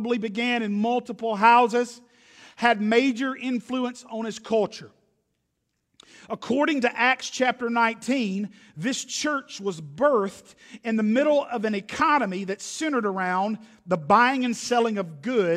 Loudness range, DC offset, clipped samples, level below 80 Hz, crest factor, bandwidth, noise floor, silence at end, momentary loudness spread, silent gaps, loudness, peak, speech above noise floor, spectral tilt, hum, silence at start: 5 LU; under 0.1%; under 0.1%; -70 dBFS; 20 dB; 13 kHz; -77 dBFS; 0 s; 12 LU; none; -24 LUFS; -4 dBFS; 53 dB; -4.5 dB/octave; none; 0 s